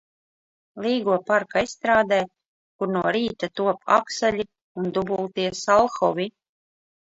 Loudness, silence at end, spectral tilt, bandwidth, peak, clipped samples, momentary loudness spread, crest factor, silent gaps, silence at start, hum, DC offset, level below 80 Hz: -23 LUFS; 0.85 s; -4.5 dB/octave; 8 kHz; -4 dBFS; under 0.1%; 11 LU; 20 dB; 2.48-2.79 s, 4.62-4.75 s; 0.75 s; none; under 0.1%; -58 dBFS